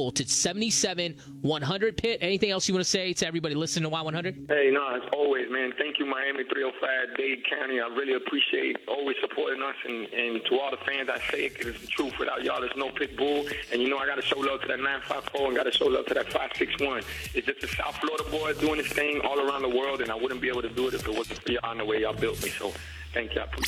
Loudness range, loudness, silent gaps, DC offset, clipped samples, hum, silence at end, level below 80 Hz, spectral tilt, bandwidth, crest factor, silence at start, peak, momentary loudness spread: 3 LU; -28 LUFS; none; under 0.1%; under 0.1%; none; 0 s; -52 dBFS; -3 dB/octave; 16 kHz; 20 dB; 0 s; -10 dBFS; 6 LU